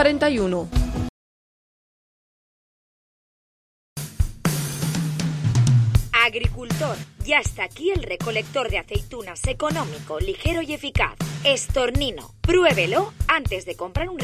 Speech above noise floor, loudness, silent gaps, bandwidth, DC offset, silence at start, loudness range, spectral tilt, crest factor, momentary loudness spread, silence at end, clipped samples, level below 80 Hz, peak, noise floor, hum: over 67 dB; -23 LUFS; 1.09-3.96 s; 16 kHz; under 0.1%; 0 s; 11 LU; -5 dB/octave; 20 dB; 11 LU; 0 s; under 0.1%; -32 dBFS; -4 dBFS; under -90 dBFS; none